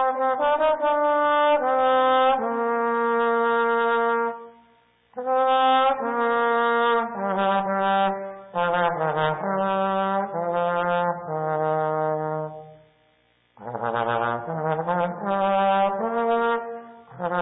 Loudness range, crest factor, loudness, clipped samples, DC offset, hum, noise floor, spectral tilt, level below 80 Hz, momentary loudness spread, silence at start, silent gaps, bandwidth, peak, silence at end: 6 LU; 12 dB; -23 LUFS; under 0.1%; under 0.1%; none; -64 dBFS; -10 dB/octave; -66 dBFS; 9 LU; 0 s; none; 4 kHz; -12 dBFS; 0 s